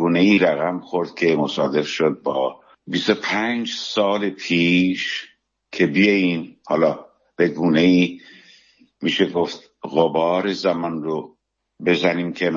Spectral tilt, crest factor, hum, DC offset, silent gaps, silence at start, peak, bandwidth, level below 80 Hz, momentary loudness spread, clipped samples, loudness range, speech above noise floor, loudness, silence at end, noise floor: -5.5 dB/octave; 18 dB; none; under 0.1%; none; 0 s; -2 dBFS; 7.4 kHz; -64 dBFS; 11 LU; under 0.1%; 3 LU; 35 dB; -20 LUFS; 0 s; -54 dBFS